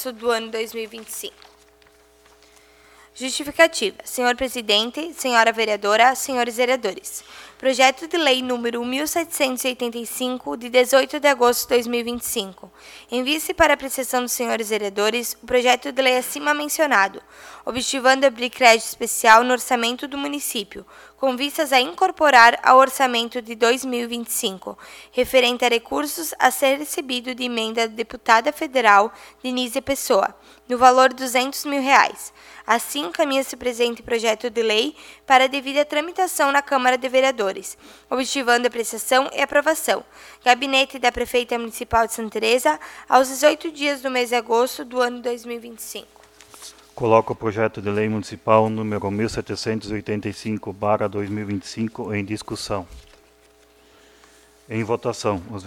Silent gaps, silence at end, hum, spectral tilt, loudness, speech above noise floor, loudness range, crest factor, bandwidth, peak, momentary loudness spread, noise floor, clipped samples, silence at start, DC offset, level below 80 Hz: none; 0 s; none; -2.5 dB/octave; -20 LUFS; 34 dB; 7 LU; 20 dB; 19 kHz; 0 dBFS; 12 LU; -54 dBFS; under 0.1%; 0 s; under 0.1%; -54 dBFS